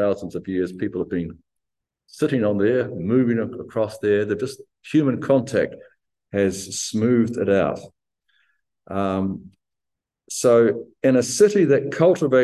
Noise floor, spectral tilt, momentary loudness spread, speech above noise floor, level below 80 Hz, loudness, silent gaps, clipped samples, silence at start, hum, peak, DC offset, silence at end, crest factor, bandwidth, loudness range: -85 dBFS; -6 dB/octave; 12 LU; 65 dB; -54 dBFS; -21 LUFS; none; under 0.1%; 0 s; none; -4 dBFS; under 0.1%; 0 s; 18 dB; 12.5 kHz; 4 LU